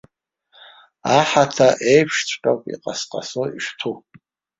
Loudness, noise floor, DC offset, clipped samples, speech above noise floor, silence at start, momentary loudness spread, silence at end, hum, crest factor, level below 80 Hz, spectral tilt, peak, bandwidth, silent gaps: -19 LUFS; -63 dBFS; under 0.1%; under 0.1%; 45 dB; 1.05 s; 13 LU; 0.6 s; none; 20 dB; -62 dBFS; -4 dB/octave; -2 dBFS; 7.8 kHz; none